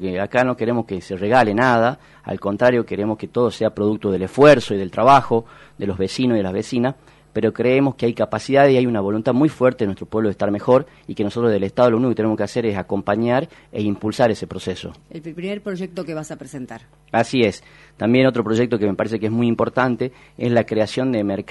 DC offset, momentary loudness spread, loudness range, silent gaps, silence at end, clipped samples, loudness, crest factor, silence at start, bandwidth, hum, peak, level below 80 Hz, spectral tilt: under 0.1%; 14 LU; 7 LU; none; 0.05 s; under 0.1%; -19 LUFS; 18 dB; 0 s; 11.5 kHz; none; -2 dBFS; -54 dBFS; -6.5 dB/octave